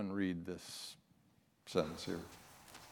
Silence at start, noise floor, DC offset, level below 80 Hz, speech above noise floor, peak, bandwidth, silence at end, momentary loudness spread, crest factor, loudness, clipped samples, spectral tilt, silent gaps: 0 s; -72 dBFS; under 0.1%; -72 dBFS; 31 dB; -20 dBFS; 18 kHz; 0 s; 18 LU; 24 dB; -42 LUFS; under 0.1%; -5 dB/octave; none